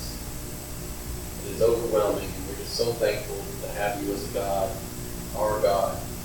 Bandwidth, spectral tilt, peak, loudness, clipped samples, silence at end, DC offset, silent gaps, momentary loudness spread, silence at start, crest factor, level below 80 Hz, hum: 18 kHz; -4.5 dB/octave; -10 dBFS; -28 LUFS; under 0.1%; 0 s; under 0.1%; none; 11 LU; 0 s; 18 dB; -40 dBFS; 60 Hz at -45 dBFS